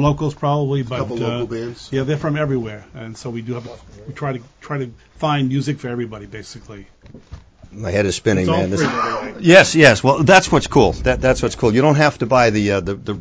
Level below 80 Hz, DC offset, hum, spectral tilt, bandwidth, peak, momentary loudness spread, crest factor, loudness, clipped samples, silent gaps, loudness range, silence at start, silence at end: -38 dBFS; under 0.1%; none; -5.5 dB/octave; 8 kHz; 0 dBFS; 20 LU; 18 dB; -16 LUFS; 0.2%; none; 12 LU; 0 s; 0 s